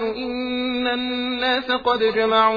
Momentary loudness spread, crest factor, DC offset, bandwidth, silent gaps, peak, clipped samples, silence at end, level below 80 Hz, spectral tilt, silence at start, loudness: 7 LU; 16 dB; under 0.1%; 5 kHz; none; -4 dBFS; under 0.1%; 0 s; -52 dBFS; -5.5 dB/octave; 0 s; -21 LUFS